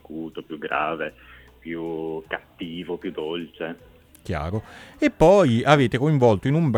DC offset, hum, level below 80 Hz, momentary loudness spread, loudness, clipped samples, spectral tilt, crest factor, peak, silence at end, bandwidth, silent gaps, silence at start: under 0.1%; none; -46 dBFS; 17 LU; -22 LUFS; under 0.1%; -7 dB/octave; 22 dB; -2 dBFS; 0 s; 13.5 kHz; none; 0.1 s